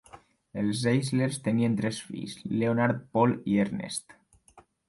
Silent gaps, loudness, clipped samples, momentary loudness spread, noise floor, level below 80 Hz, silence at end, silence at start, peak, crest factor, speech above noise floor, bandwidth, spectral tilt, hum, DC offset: none; -28 LUFS; under 0.1%; 11 LU; -59 dBFS; -62 dBFS; 0.3 s; 0.15 s; -12 dBFS; 18 dB; 32 dB; 11.5 kHz; -6 dB/octave; none; under 0.1%